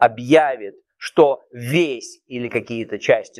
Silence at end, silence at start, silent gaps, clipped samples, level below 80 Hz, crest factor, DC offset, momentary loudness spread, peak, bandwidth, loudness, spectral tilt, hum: 0.15 s; 0 s; none; under 0.1%; -62 dBFS; 18 dB; under 0.1%; 16 LU; -2 dBFS; 14 kHz; -19 LUFS; -5.5 dB/octave; none